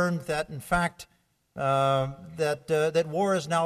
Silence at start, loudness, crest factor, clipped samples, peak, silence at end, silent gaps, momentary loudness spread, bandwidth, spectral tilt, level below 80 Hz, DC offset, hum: 0 s; -27 LUFS; 16 dB; under 0.1%; -12 dBFS; 0 s; none; 7 LU; 13.5 kHz; -5.5 dB/octave; -52 dBFS; under 0.1%; none